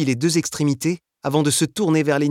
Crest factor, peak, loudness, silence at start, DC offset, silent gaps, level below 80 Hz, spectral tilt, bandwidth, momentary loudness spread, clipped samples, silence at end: 14 dB; -4 dBFS; -20 LUFS; 0 s; under 0.1%; none; -60 dBFS; -5 dB/octave; 16.5 kHz; 5 LU; under 0.1%; 0 s